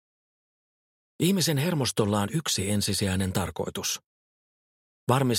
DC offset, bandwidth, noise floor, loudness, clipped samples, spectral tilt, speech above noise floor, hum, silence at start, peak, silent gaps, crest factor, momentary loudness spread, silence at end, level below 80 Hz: under 0.1%; 16.5 kHz; under -90 dBFS; -27 LUFS; under 0.1%; -4.5 dB/octave; over 64 dB; none; 1.2 s; -8 dBFS; 4.06-5.07 s; 20 dB; 6 LU; 0 s; -56 dBFS